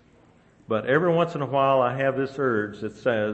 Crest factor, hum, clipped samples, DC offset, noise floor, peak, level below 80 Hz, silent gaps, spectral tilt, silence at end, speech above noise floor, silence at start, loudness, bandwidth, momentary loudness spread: 16 dB; none; under 0.1%; under 0.1%; -56 dBFS; -8 dBFS; -64 dBFS; none; -7.5 dB/octave; 0 s; 33 dB; 0.7 s; -24 LUFS; 8.2 kHz; 8 LU